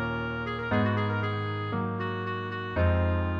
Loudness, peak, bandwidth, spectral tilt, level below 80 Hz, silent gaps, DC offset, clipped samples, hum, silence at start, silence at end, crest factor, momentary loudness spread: -29 LUFS; -14 dBFS; 5.2 kHz; -9 dB/octave; -42 dBFS; none; under 0.1%; under 0.1%; none; 0 s; 0 s; 14 dB; 6 LU